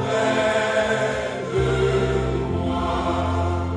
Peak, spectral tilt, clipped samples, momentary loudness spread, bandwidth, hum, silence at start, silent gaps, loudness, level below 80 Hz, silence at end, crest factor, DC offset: -8 dBFS; -6 dB/octave; under 0.1%; 4 LU; 10 kHz; none; 0 s; none; -22 LUFS; -34 dBFS; 0 s; 14 dB; under 0.1%